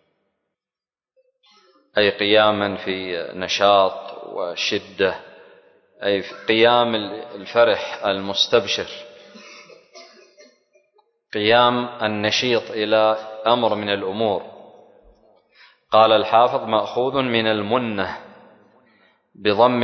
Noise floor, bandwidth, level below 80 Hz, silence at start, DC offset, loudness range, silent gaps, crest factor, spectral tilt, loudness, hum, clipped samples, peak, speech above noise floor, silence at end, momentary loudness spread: under -90 dBFS; 6.4 kHz; -60 dBFS; 1.95 s; under 0.1%; 4 LU; none; 20 dB; -4 dB/octave; -19 LUFS; none; under 0.1%; -2 dBFS; over 71 dB; 0 s; 12 LU